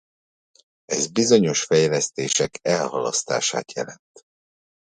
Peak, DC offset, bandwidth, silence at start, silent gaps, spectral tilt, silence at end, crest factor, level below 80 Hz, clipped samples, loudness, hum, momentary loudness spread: -4 dBFS; under 0.1%; 10.5 kHz; 0.9 s; none; -3.5 dB/octave; 0.95 s; 20 dB; -64 dBFS; under 0.1%; -21 LUFS; none; 11 LU